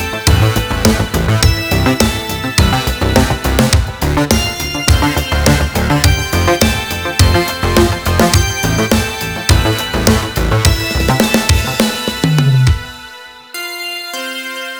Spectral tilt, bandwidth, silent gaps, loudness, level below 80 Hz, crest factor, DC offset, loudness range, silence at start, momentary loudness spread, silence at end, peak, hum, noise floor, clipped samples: -4.5 dB/octave; over 20 kHz; none; -13 LUFS; -20 dBFS; 12 dB; under 0.1%; 1 LU; 0 s; 9 LU; 0 s; 0 dBFS; none; -34 dBFS; under 0.1%